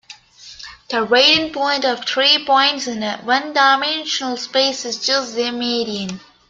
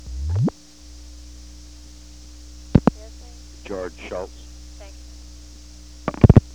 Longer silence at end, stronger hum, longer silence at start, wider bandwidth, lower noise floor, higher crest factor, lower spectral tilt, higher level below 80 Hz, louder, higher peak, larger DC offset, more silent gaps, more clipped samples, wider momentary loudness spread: first, 0.3 s vs 0 s; second, none vs 60 Hz at -40 dBFS; about the same, 0.1 s vs 0.05 s; second, 9 kHz vs 10.5 kHz; about the same, -41 dBFS vs -44 dBFS; about the same, 18 dB vs 22 dB; second, -2 dB/octave vs -8 dB/octave; second, -60 dBFS vs -32 dBFS; first, -16 LUFS vs -21 LUFS; about the same, 0 dBFS vs 0 dBFS; second, under 0.1% vs 0.3%; neither; neither; second, 11 LU vs 24 LU